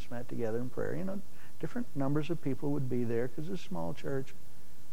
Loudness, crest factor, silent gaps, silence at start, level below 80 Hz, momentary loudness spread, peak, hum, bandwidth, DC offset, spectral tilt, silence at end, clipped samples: -37 LUFS; 16 dB; none; 0 s; -62 dBFS; 10 LU; -18 dBFS; none; 16.5 kHz; 4%; -7.5 dB/octave; 0 s; under 0.1%